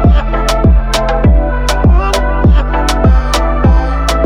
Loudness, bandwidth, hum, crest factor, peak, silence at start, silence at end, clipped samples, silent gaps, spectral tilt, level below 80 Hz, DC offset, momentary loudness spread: -11 LUFS; 13 kHz; none; 8 dB; 0 dBFS; 0 s; 0 s; under 0.1%; none; -6 dB/octave; -10 dBFS; under 0.1%; 3 LU